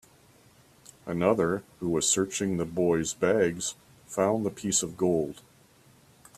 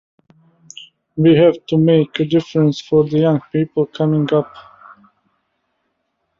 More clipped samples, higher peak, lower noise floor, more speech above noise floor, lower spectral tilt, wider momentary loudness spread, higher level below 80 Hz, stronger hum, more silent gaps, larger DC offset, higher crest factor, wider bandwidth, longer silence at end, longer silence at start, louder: neither; second, -8 dBFS vs -2 dBFS; second, -59 dBFS vs -70 dBFS; second, 32 dB vs 56 dB; second, -4 dB/octave vs -8 dB/octave; second, 11 LU vs 18 LU; about the same, -60 dBFS vs -56 dBFS; neither; neither; neither; about the same, 20 dB vs 16 dB; first, 15 kHz vs 7.4 kHz; second, 1.05 s vs 1.8 s; about the same, 1.05 s vs 1.15 s; second, -27 LUFS vs -15 LUFS